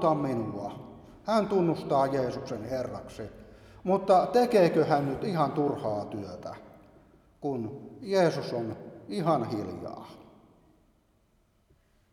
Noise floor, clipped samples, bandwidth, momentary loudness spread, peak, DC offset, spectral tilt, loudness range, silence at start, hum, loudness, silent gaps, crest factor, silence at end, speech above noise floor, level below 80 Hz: -68 dBFS; under 0.1%; 14.5 kHz; 19 LU; -10 dBFS; under 0.1%; -7 dB/octave; 7 LU; 0 s; none; -28 LUFS; none; 20 dB; 1.9 s; 40 dB; -62 dBFS